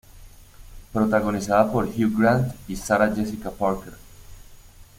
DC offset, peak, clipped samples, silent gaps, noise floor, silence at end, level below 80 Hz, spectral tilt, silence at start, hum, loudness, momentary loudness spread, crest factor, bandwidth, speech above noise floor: under 0.1%; -4 dBFS; under 0.1%; none; -46 dBFS; 0.15 s; -44 dBFS; -6.5 dB/octave; 0.15 s; none; -23 LUFS; 11 LU; 20 dB; 16.5 kHz; 25 dB